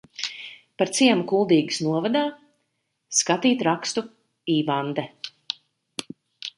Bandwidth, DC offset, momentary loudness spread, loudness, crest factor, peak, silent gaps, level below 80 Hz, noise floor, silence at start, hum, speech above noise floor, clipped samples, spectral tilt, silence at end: 11.5 kHz; under 0.1%; 16 LU; -23 LUFS; 20 dB; -4 dBFS; none; -72 dBFS; -75 dBFS; 0.2 s; none; 53 dB; under 0.1%; -3.5 dB/octave; 0.1 s